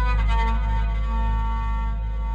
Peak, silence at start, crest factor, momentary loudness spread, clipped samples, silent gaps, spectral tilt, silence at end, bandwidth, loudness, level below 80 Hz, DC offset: -12 dBFS; 0 s; 10 dB; 5 LU; under 0.1%; none; -7 dB/octave; 0 s; 5 kHz; -25 LUFS; -22 dBFS; under 0.1%